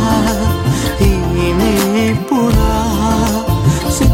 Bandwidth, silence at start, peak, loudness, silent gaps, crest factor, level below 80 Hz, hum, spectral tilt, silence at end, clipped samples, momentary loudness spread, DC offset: 17 kHz; 0 s; 0 dBFS; -14 LUFS; none; 12 dB; -20 dBFS; none; -5.5 dB/octave; 0 s; under 0.1%; 2 LU; under 0.1%